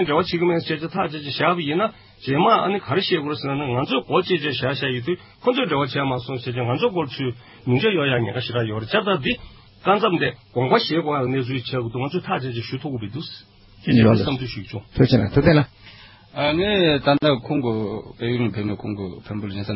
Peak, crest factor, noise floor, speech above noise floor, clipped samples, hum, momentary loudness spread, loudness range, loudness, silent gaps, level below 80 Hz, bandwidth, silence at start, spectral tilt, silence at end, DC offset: -2 dBFS; 20 dB; -45 dBFS; 24 dB; under 0.1%; none; 12 LU; 3 LU; -21 LUFS; none; -46 dBFS; 5.8 kHz; 0 s; -11 dB/octave; 0 s; under 0.1%